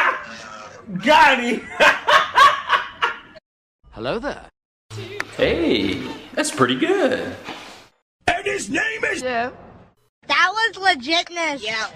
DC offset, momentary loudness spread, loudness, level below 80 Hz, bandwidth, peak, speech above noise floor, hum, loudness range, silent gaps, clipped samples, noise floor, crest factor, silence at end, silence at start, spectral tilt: under 0.1%; 20 LU; -19 LUFS; -50 dBFS; 16 kHz; -2 dBFS; 21 dB; none; 8 LU; 3.46-3.79 s, 4.65-4.89 s, 8.02-8.20 s, 10.09-10.22 s; under 0.1%; -41 dBFS; 18 dB; 0 s; 0 s; -3 dB/octave